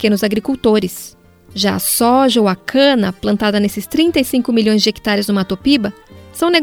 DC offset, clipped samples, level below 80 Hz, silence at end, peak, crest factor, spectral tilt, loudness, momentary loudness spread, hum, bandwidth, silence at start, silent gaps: under 0.1%; under 0.1%; -44 dBFS; 0 s; 0 dBFS; 14 dB; -4 dB/octave; -15 LUFS; 7 LU; none; 18.5 kHz; 0 s; none